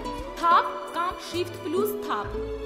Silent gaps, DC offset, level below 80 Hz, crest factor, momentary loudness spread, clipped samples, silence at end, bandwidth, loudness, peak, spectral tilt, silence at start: none; under 0.1%; -44 dBFS; 18 dB; 10 LU; under 0.1%; 0 s; 16 kHz; -26 LUFS; -8 dBFS; -4.5 dB/octave; 0 s